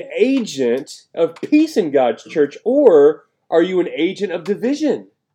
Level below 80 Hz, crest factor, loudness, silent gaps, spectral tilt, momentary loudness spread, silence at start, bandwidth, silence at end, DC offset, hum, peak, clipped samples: -72 dBFS; 16 dB; -17 LUFS; none; -5.5 dB/octave; 10 LU; 0 s; 11 kHz; 0.3 s; under 0.1%; none; 0 dBFS; under 0.1%